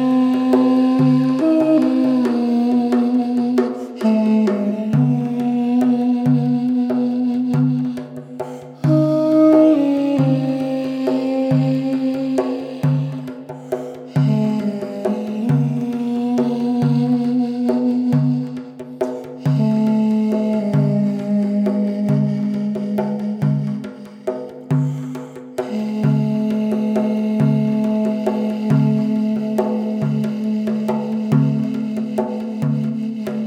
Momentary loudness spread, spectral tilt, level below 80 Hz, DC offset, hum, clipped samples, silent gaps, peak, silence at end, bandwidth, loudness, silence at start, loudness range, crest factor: 10 LU; -9 dB/octave; -64 dBFS; under 0.1%; none; under 0.1%; none; -2 dBFS; 0 s; 9.6 kHz; -18 LUFS; 0 s; 5 LU; 16 dB